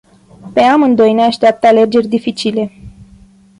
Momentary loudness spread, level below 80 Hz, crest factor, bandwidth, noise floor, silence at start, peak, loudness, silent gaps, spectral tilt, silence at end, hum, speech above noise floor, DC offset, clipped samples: 9 LU; -48 dBFS; 12 dB; 11 kHz; -43 dBFS; 0.45 s; -2 dBFS; -11 LUFS; none; -5.5 dB/octave; 0.55 s; none; 32 dB; under 0.1%; under 0.1%